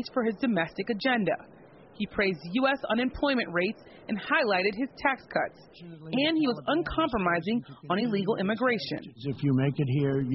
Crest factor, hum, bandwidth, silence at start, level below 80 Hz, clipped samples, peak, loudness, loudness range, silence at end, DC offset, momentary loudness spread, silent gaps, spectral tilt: 16 dB; none; 5.8 kHz; 0 s; -54 dBFS; under 0.1%; -12 dBFS; -28 LUFS; 1 LU; 0 s; under 0.1%; 9 LU; none; -4.5 dB/octave